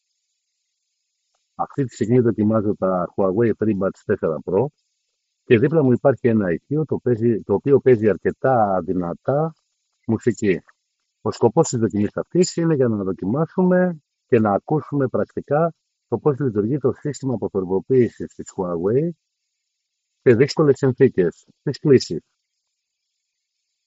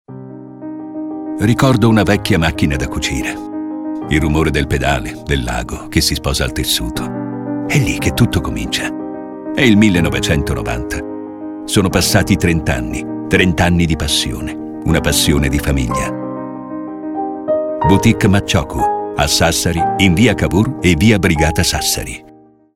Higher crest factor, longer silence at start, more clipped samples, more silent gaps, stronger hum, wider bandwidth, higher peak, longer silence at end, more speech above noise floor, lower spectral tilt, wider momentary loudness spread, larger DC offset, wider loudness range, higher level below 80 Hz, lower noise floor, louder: about the same, 18 dB vs 16 dB; first, 1.6 s vs 0.1 s; neither; neither; neither; second, 8 kHz vs 17 kHz; about the same, -2 dBFS vs 0 dBFS; first, 1.65 s vs 0.45 s; first, 59 dB vs 30 dB; first, -7.5 dB/octave vs -4.5 dB/octave; second, 9 LU vs 14 LU; neither; about the same, 4 LU vs 4 LU; second, -60 dBFS vs -28 dBFS; first, -78 dBFS vs -44 dBFS; second, -20 LUFS vs -15 LUFS